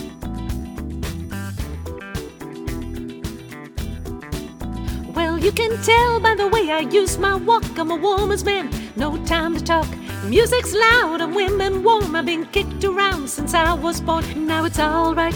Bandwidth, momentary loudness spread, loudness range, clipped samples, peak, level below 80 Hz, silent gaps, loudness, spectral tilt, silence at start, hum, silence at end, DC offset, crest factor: over 20 kHz; 15 LU; 13 LU; under 0.1%; -4 dBFS; -34 dBFS; none; -20 LUFS; -4.5 dB/octave; 0 s; none; 0 s; under 0.1%; 16 dB